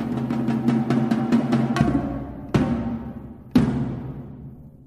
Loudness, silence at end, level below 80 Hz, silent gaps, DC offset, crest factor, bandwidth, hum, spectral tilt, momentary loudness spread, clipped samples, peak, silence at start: -23 LUFS; 0.15 s; -42 dBFS; none; under 0.1%; 18 dB; 12 kHz; none; -8 dB/octave; 16 LU; under 0.1%; -4 dBFS; 0 s